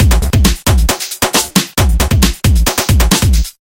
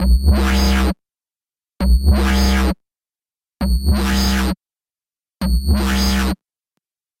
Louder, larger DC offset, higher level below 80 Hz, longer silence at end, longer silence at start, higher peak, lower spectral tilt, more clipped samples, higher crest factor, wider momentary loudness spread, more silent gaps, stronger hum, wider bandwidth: first, -12 LUFS vs -17 LUFS; neither; about the same, -14 dBFS vs -18 dBFS; second, 0.1 s vs 0.85 s; about the same, 0 s vs 0 s; first, 0 dBFS vs -4 dBFS; second, -4 dB/octave vs -5.5 dB/octave; neither; about the same, 10 dB vs 14 dB; second, 3 LU vs 10 LU; neither; neither; about the same, 17 kHz vs 16.5 kHz